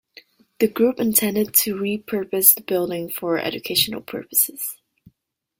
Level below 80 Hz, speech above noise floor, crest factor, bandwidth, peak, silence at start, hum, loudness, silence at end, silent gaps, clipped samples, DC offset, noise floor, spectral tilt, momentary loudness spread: -62 dBFS; 53 dB; 22 dB; 17 kHz; 0 dBFS; 0.6 s; none; -19 LUFS; 0.85 s; none; under 0.1%; under 0.1%; -74 dBFS; -2.5 dB/octave; 12 LU